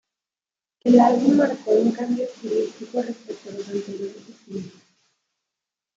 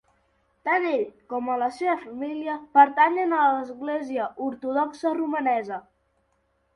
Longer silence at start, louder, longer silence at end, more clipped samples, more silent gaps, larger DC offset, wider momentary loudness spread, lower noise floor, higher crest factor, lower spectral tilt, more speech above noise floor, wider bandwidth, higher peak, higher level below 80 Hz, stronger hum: first, 0.85 s vs 0.65 s; first, -21 LUFS vs -24 LUFS; first, 1.25 s vs 0.95 s; neither; neither; neither; first, 20 LU vs 13 LU; first, under -90 dBFS vs -70 dBFS; about the same, 20 dB vs 20 dB; first, -6.5 dB/octave vs -5 dB/octave; first, over 69 dB vs 46 dB; second, 7.8 kHz vs 11 kHz; about the same, -2 dBFS vs -4 dBFS; about the same, -70 dBFS vs -72 dBFS; second, none vs 50 Hz at -70 dBFS